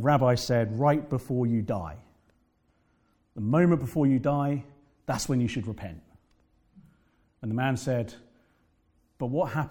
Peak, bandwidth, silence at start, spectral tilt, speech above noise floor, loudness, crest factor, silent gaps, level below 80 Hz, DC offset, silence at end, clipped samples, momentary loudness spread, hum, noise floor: -10 dBFS; 18 kHz; 0 s; -7 dB/octave; 42 dB; -27 LUFS; 18 dB; none; -56 dBFS; under 0.1%; 0 s; under 0.1%; 16 LU; none; -69 dBFS